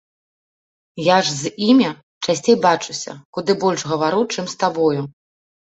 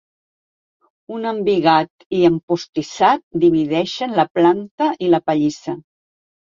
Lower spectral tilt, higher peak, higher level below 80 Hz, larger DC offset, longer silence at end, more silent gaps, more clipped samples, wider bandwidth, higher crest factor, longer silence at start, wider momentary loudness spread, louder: second, -4.5 dB/octave vs -6 dB/octave; about the same, -2 dBFS vs -2 dBFS; about the same, -62 dBFS vs -60 dBFS; neither; second, 0.55 s vs 0.7 s; second, 2.03-2.21 s, 3.25-3.33 s vs 1.90-1.99 s, 2.06-2.11 s, 2.43-2.48 s, 2.69-2.73 s, 3.23-3.31 s, 4.30-4.35 s, 4.71-4.78 s; neither; first, 8.2 kHz vs 7.4 kHz; about the same, 18 dB vs 18 dB; second, 0.95 s vs 1.1 s; about the same, 12 LU vs 11 LU; about the same, -18 LUFS vs -18 LUFS